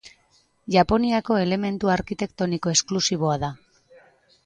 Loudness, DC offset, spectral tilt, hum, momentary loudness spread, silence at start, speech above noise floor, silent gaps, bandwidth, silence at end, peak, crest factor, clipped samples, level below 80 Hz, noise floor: -23 LUFS; under 0.1%; -4.5 dB/octave; none; 8 LU; 0.05 s; 40 dB; none; 10.5 kHz; 0.9 s; -4 dBFS; 20 dB; under 0.1%; -48 dBFS; -63 dBFS